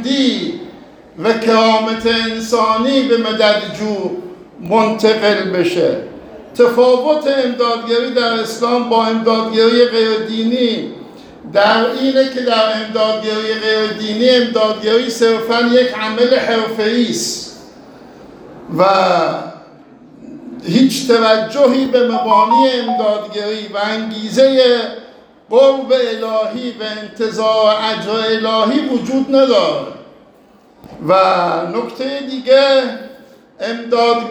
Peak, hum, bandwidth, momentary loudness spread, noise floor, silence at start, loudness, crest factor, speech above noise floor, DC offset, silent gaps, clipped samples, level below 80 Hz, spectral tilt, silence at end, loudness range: 0 dBFS; none; 20 kHz; 12 LU; -46 dBFS; 0 s; -14 LUFS; 14 dB; 33 dB; under 0.1%; none; under 0.1%; -56 dBFS; -4 dB/octave; 0 s; 3 LU